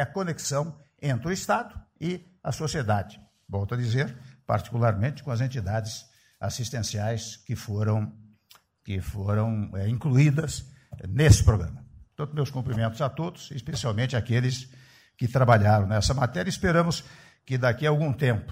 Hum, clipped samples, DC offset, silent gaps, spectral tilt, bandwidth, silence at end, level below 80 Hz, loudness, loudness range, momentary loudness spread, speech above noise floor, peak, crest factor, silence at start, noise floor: none; under 0.1%; under 0.1%; none; -6 dB/octave; 16 kHz; 0 s; -42 dBFS; -27 LUFS; 6 LU; 14 LU; 34 dB; -6 dBFS; 20 dB; 0 s; -59 dBFS